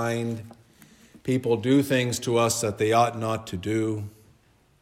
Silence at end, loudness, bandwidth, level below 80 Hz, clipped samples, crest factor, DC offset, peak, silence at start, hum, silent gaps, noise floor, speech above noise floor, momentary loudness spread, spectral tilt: 0.7 s; -25 LUFS; 16 kHz; -64 dBFS; under 0.1%; 18 dB; under 0.1%; -8 dBFS; 0 s; none; none; -61 dBFS; 36 dB; 12 LU; -5 dB/octave